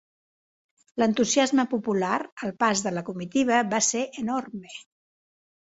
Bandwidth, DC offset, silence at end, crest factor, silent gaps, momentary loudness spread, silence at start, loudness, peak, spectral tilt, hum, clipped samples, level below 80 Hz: 8 kHz; under 0.1%; 0.95 s; 20 dB; 2.32-2.37 s; 16 LU; 0.95 s; -25 LUFS; -8 dBFS; -3.5 dB/octave; none; under 0.1%; -68 dBFS